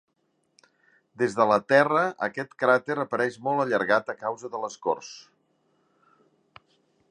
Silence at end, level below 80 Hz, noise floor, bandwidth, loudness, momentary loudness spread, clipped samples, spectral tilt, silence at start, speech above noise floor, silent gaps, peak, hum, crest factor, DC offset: 1.9 s; -74 dBFS; -73 dBFS; 10.5 kHz; -25 LUFS; 13 LU; under 0.1%; -5 dB/octave; 1.2 s; 48 dB; none; -6 dBFS; none; 22 dB; under 0.1%